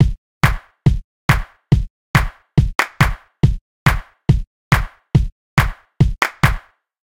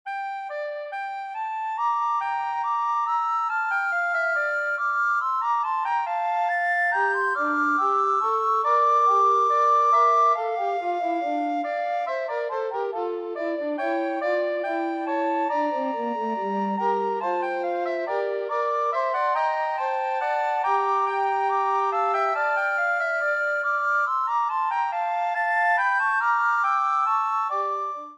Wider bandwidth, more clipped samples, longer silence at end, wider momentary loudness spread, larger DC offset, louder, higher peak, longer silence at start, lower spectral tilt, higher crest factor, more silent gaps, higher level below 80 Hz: first, 17 kHz vs 9.4 kHz; neither; first, 0.45 s vs 0 s; second, 3 LU vs 8 LU; neither; first, -19 LUFS vs -24 LUFS; first, 0 dBFS vs -12 dBFS; about the same, 0 s vs 0.05 s; first, -6 dB/octave vs -4.5 dB/octave; first, 18 dB vs 12 dB; first, 0.18-0.41 s, 1.04-1.29 s, 1.90-2.14 s, 3.61-3.86 s, 4.47-4.71 s, 5.32-5.57 s vs none; first, -24 dBFS vs -86 dBFS